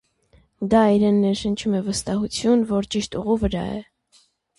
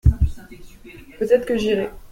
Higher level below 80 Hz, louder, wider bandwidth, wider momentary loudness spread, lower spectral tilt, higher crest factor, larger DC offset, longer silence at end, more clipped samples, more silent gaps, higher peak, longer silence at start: second, -42 dBFS vs -26 dBFS; about the same, -21 LUFS vs -21 LUFS; second, 11.5 kHz vs 15.5 kHz; second, 10 LU vs 20 LU; second, -5.5 dB/octave vs -7.5 dB/octave; about the same, 16 dB vs 18 dB; neither; first, 0.75 s vs 0.05 s; neither; neither; second, -6 dBFS vs -2 dBFS; first, 0.6 s vs 0.05 s